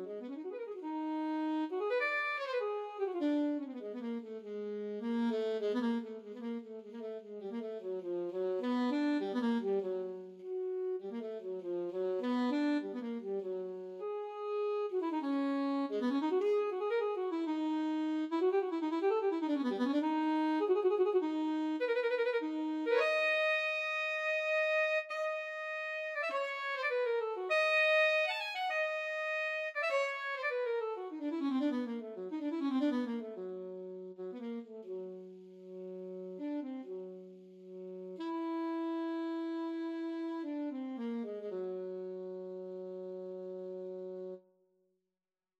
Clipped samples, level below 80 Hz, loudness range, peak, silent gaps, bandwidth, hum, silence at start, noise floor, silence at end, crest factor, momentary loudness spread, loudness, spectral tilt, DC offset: under 0.1%; under -90 dBFS; 11 LU; -20 dBFS; none; 10.5 kHz; none; 0 s; under -90 dBFS; 1.2 s; 16 dB; 13 LU; -36 LUFS; -5 dB/octave; under 0.1%